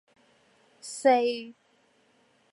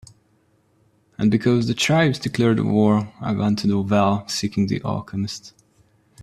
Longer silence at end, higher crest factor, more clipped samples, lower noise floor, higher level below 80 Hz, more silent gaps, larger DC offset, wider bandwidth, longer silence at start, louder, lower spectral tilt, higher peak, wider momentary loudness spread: first, 1 s vs 0.75 s; about the same, 20 dB vs 18 dB; neither; first, -66 dBFS vs -62 dBFS; second, -88 dBFS vs -54 dBFS; neither; neither; second, 11.5 kHz vs 13 kHz; second, 0.85 s vs 1.2 s; second, -25 LUFS vs -20 LUFS; second, -2 dB/octave vs -6 dB/octave; second, -10 dBFS vs -4 dBFS; first, 23 LU vs 9 LU